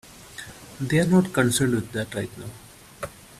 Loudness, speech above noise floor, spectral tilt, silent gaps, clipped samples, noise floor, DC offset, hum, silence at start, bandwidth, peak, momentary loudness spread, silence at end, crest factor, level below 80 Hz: -23 LUFS; 19 dB; -5.5 dB/octave; none; under 0.1%; -42 dBFS; under 0.1%; none; 0.1 s; 14.5 kHz; -6 dBFS; 21 LU; 0.3 s; 20 dB; -52 dBFS